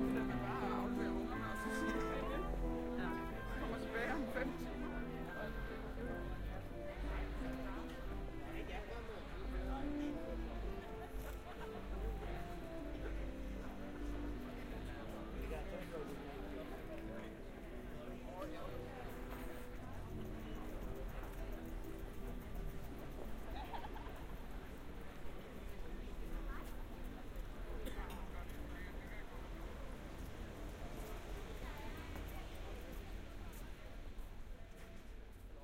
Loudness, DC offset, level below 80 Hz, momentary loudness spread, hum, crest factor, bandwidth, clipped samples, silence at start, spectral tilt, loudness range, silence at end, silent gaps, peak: -47 LUFS; under 0.1%; -48 dBFS; 11 LU; none; 18 dB; 16 kHz; under 0.1%; 0 s; -6.5 dB/octave; 9 LU; 0 s; none; -26 dBFS